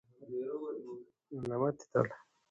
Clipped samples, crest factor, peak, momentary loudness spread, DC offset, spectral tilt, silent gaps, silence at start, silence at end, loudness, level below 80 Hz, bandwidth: under 0.1%; 24 dB; -14 dBFS; 15 LU; under 0.1%; -8 dB/octave; none; 0.2 s; 0.3 s; -37 LUFS; -74 dBFS; 8.2 kHz